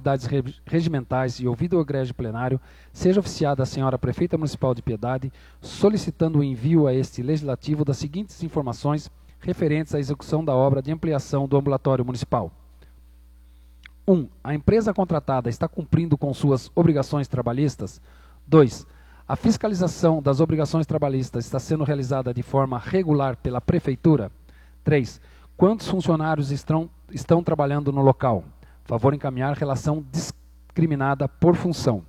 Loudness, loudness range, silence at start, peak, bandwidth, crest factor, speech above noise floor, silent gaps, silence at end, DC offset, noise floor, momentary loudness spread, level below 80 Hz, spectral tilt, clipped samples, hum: -23 LUFS; 3 LU; 0 s; -2 dBFS; 12 kHz; 22 dB; 27 dB; none; 0.05 s; under 0.1%; -49 dBFS; 8 LU; -46 dBFS; -7.5 dB/octave; under 0.1%; none